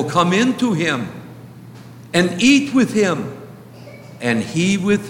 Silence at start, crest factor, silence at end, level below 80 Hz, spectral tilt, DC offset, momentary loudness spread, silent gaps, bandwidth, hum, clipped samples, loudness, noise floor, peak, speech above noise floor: 0 s; 16 dB; 0 s; -58 dBFS; -5 dB/octave; under 0.1%; 24 LU; none; 16.5 kHz; none; under 0.1%; -17 LUFS; -38 dBFS; -2 dBFS; 22 dB